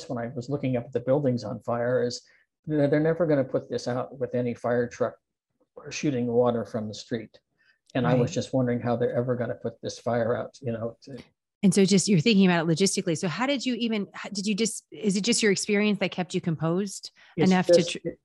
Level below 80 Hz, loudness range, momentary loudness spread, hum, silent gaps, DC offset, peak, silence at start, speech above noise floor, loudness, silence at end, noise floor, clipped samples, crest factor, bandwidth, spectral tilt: -64 dBFS; 5 LU; 13 LU; none; 2.59-2.63 s, 11.55-11.61 s; under 0.1%; -6 dBFS; 0 s; 49 dB; -26 LUFS; 0.1 s; -74 dBFS; under 0.1%; 20 dB; 12 kHz; -5 dB/octave